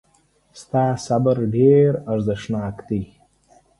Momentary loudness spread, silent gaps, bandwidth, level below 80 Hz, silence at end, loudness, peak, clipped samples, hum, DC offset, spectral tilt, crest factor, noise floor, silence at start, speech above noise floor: 13 LU; none; 11.5 kHz; -50 dBFS; 0.75 s; -20 LUFS; -4 dBFS; under 0.1%; none; under 0.1%; -8 dB/octave; 16 dB; -61 dBFS; 0.55 s; 42 dB